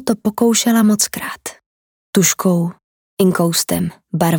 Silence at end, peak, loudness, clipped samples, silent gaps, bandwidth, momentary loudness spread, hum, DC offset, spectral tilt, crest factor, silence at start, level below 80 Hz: 0 s; -2 dBFS; -16 LUFS; under 0.1%; 1.66-2.13 s, 2.84-3.17 s; over 20 kHz; 12 LU; none; under 0.1%; -4.5 dB/octave; 16 dB; 0 s; -56 dBFS